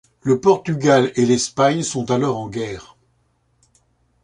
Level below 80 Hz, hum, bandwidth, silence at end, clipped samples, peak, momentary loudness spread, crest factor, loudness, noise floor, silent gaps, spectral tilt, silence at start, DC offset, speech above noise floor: -54 dBFS; none; 11 kHz; 1.4 s; under 0.1%; -2 dBFS; 12 LU; 18 dB; -18 LUFS; -63 dBFS; none; -5 dB/octave; 0.25 s; under 0.1%; 46 dB